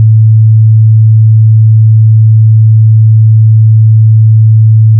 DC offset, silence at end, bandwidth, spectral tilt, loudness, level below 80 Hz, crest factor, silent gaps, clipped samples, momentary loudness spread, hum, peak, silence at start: under 0.1%; 0 s; 0.2 kHz; -30 dB/octave; -5 LUFS; -48 dBFS; 4 dB; none; 0.6%; 0 LU; none; 0 dBFS; 0 s